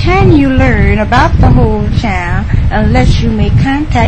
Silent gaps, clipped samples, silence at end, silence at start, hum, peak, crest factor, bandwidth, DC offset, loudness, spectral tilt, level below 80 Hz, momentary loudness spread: none; 0.6%; 0 s; 0 s; none; 0 dBFS; 8 dB; 9 kHz; 4%; -9 LUFS; -7.5 dB/octave; -14 dBFS; 6 LU